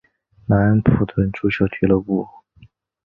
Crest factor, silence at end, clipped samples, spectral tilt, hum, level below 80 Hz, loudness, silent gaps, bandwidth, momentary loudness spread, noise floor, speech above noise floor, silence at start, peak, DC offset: 18 dB; 0.8 s; under 0.1%; -10.5 dB/octave; none; -38 dBFS; -19 LUFS; none; 5.4 kHz; 9 LU; -51 dBFS; 34 dB; 0.5 s; 0 dBFS; under 0.1%